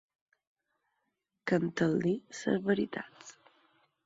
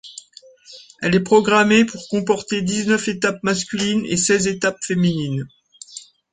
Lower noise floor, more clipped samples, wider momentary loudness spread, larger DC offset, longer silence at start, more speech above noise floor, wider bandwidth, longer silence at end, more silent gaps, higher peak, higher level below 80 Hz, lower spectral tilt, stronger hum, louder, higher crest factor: first, -83 dBFS vs -47 dBFS; neither; second, 18 LU vs 22 LU; neither; first, 1.45 s vs 0.05 s; first, 51 dB vs 28 dB; second, 8 kHz vs 9.6 kHz; first, 0.75 s vs 0.35 s; neither; second, -14 dBFS vs -2 dBFS; second, -70 dBFS vs -54 dBFS; first, -6.5 dB/octave vs -4.5 dB/octave; neither; second, -32 LUFS vs -18 LUFS; about the same, 20 dB vs 18 dB